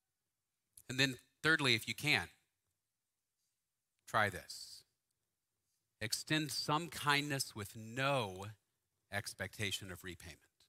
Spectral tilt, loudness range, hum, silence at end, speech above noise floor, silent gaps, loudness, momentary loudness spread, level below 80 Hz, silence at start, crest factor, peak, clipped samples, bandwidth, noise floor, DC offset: -3 dB/octave; 7 LU; none; 0.35 s; over 52 dB; none; -37 LUFS; 17 LU; -72 dBFS; 0.9 s; 24 dB; -16 dBFS; under 0.1%; 16 kHz; under -90 dBFS; under 0.1%